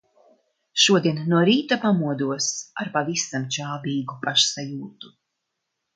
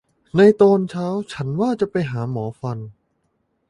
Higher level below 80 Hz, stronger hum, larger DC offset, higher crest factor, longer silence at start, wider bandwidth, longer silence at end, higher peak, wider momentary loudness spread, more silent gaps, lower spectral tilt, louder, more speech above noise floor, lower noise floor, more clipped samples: second, -70 dBFS vs -58 dBFS; neither; neither; about the same, 20 dB vs 18 dB; first, 0.75 s vs 0.35 s; about the same, 9.6 kHz vs 10.5 kHz; about the same, 0.9 s vs 0.8 s; about the same, -4 dBFS vs -2 dBFS; second, 12 LU vs 16 LU; neither; second, -3.5 dB/octave vs -8 dB/octave; second, -22 LUFS vs -19 LUFS; first, 57 dB vs 50 dB; first, -80 dBFS vs -69 dBFS; neither